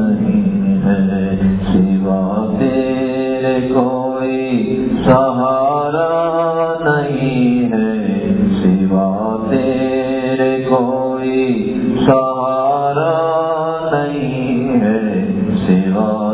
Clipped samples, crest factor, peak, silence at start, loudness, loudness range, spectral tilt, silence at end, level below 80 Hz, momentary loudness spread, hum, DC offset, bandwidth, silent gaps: under 0.1%; 14 dB; 0 dBFS; 0 s; -15 LUFS; 1 LU; -12 dB/octave; 0 s; -40 dBFS; 4 LU; none; under 0.1%; 4 kHz; none